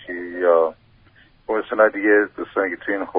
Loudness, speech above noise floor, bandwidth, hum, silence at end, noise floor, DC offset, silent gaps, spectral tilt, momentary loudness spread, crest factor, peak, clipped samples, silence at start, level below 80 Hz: -20 LUFS; 34 dB; 4 kHz; none; 0 s; -53 dBFS; under 0.1%; none; -3 dB/octave; 9 LU; 18 dB; -2 dBFS; under 0.1%; 0 s; -60 dBFS